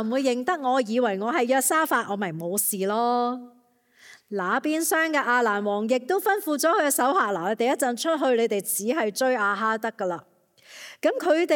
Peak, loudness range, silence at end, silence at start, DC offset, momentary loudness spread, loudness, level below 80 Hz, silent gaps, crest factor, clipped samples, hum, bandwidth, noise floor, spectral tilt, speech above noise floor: -8 dBFS; 3 LU; 0 s; 0 s; under 0.1%; 8 LU; -24 LUFS; -86 dBFS; none; 16 dB; under 0.1%; none; 17.5 kHz; -60 dBFS; -3 dB/octave; 37 dB